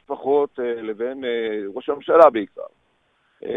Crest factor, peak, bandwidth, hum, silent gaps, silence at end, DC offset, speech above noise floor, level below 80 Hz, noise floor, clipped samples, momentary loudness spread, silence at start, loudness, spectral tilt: 22 dB; 0 dBFS; 5.4 kHz; none; none; 0 s; under 0.1%; 45 dB; -66 dBFS; -65 dBFS; under 0.1%; 21 LU; 0.1 s; -20 LUFS; -6.5 dB/octave